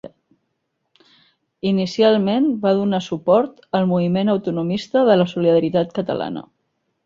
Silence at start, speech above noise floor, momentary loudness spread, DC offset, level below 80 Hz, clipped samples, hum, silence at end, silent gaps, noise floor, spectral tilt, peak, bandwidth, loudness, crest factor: 0.05 s; 55 dB; 8 LU; under 0.1%; -60 dBFS; under 0.1%; none; 0.65 s; none; -73 dBFS; -7.5 dB/octave; -2 dBFS; 7.6 kHz; -19 LUFS; 18 dB